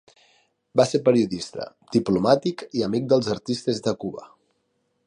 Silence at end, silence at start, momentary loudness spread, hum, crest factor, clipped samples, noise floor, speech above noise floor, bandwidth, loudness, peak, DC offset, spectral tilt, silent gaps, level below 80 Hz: 0.8 s; 0.75 s; 12 LU; none; 20 dB; under 0.1%; -72 dBFS; 49 dB; 11 kHz; -23 LUFS; -4 dBFS; under 0.1%; -6 dB/octave; none; -60 dBFS